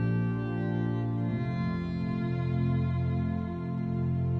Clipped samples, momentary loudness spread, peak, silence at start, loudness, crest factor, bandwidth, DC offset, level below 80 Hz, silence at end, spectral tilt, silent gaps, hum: under 0.1%; 4 LU; -18 dBFS; 0 s; -31 LUFS; 12 dB; 4.7 kHz; under 0.1%; -48 dBFS; 0 s; -10.5 dB/octave; none; none